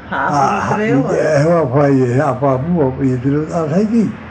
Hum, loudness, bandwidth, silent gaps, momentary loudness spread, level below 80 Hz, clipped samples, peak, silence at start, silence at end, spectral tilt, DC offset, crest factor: none; -14 LUFS; 9.2 kHz; none; 4 LU; -44 dBFS; under 0.1%; -2 dBFS; 0 s; 0 s; -8 dB/octave; under 0.1%; 12 dB